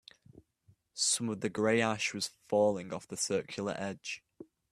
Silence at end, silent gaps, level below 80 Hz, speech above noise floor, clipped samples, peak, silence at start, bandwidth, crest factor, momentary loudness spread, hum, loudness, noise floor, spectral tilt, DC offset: 0.3 s; none; -72 dBFS; 36 dB; under 0.1%; -14 dBFS; 0.35 s; 14 kHz; 20 dB; 12 LU; none; -33 LUFS; -68 dBFS; -3 dB/octave; under 0.1%